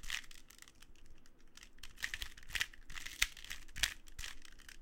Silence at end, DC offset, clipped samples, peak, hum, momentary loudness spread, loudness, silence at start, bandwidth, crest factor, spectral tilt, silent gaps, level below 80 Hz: 0 s; under 0.1%; under 0.1%; -8 dBFS; none; 22 LU; -41 LUFS; 0 s; 17 kHz; 36 dB; 0.5 dB/octave; none; -54 dBFS